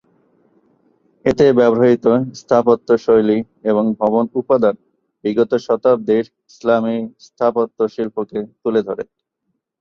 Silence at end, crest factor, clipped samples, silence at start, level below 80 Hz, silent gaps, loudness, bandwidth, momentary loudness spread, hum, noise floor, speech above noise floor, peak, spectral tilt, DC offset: 0.8 s; 16 dB; under 0.1%; 1.25 s; -54 dBFS; none; -17 LUFS; 7.2 kHz; 12 LU; none; -73 dBFS; 57 dB; -2 dBFS; -7.5 dB/octave; under 0.1%